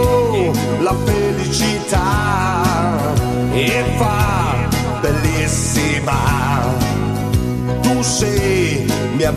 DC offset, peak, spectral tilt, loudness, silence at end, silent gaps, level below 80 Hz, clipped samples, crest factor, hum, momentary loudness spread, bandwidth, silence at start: under 0.1%; 0 dBFS; -5 dB/octave; -16 LUFS; 0 s; none; -28 dBFS; under 0.1%; 16 dB; none; 3 LU; 14 kHz; 0 s